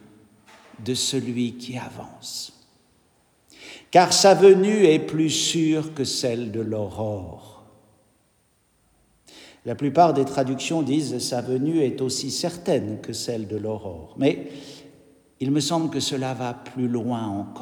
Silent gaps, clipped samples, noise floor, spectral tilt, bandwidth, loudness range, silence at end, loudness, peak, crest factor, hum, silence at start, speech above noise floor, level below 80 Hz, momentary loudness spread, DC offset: none; under 0.1%; -65 dBFS; -4.5 dB/octave; 19 kHz; 11 LU; 0 s; -22 LUFS; -2 dBFS; 22 dB; none; 0.8 s; 42 dB; -64 dBFS; 17 LU; under 0.1%